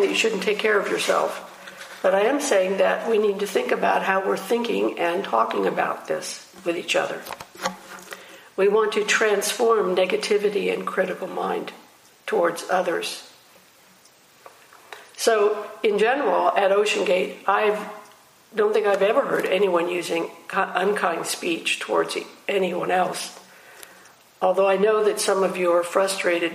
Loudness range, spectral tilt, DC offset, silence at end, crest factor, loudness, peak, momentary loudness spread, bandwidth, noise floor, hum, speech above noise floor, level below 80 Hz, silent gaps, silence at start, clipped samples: 5 LU; -3 dB/octave; under 0.1%; 0 s; 18 dB; -22 LUFS; -4 dBFS; 12 LU; 15.5 kHz; -54 dBFS; none; 32 dB; -76 dBFS; none; 0 s; under 0.1%